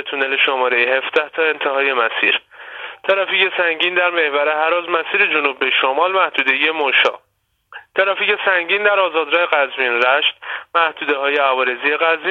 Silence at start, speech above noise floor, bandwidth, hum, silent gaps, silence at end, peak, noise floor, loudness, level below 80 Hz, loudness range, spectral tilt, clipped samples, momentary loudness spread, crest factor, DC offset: 0 s; 50 dB; 7 kHz; none; none; 0 s; 0 dBFS; -66 dBFS; -16 LUFS; -72 dBFS; 1 LU; -3.5 dB/octave; under 0.1%; 5 LU; 16 dB; under 0.1%